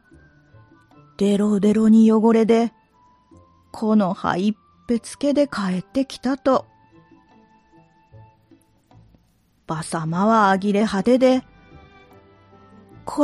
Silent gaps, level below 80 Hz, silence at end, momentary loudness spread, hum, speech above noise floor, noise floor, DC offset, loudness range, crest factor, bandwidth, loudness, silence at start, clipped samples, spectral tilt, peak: none; -58 dBFS; 0 s; 12 LU; none; 43 dB; -61 dBFS; under 0.1%; 10 LU; 18 dB; 11.5 kHz; -19 LUFS; 1.2 s; under 0.1%; -6.5 dB/octave; -4 dBFS